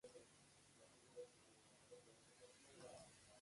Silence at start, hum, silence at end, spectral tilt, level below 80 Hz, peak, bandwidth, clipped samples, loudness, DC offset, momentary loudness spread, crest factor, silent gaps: 0.05 s; none; 0 s; -3 dB/octave; -88 dBFS; -48 dBFS; 11.5 kHz; under 0.1%; -65 LUFS; under 0.1%; 8 LU; 18 dB; none